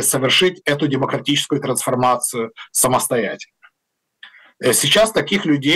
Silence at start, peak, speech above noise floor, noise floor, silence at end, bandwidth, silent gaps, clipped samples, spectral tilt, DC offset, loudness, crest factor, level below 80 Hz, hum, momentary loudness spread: 0 s; -6 dBFS; 58 dB; -76 dBFS; 0 s; 16 kHz; none; under 0.1%; -3 dB/octave; under 0.1%; -17 LUFS; 12 dB; -54 dBFS; none; 8 LU